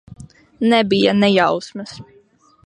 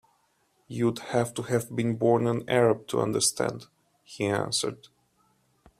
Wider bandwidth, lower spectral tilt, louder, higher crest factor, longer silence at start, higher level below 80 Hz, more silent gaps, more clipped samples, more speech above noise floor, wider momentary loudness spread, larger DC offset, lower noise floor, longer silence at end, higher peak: second, 10 kHz vs 15.5 kHz; first, -6 dB/octave vs -4.5 dB/octave; first, -16 LUFS vs -27 LUFS; about the same, 18 dB vs 20 dB; second, 0.2 s vs 0.7 s; first, -54 dBFS vs -66 dBFS; neither; neither; second, 37 dB vs 43 dB; first, 18 LU vs 10 LU; neither; second, -53 dBFS vs -69 dBFS; second, 0.6 s vs 1.05 s; first, -2 dBFS vs -8 dBFS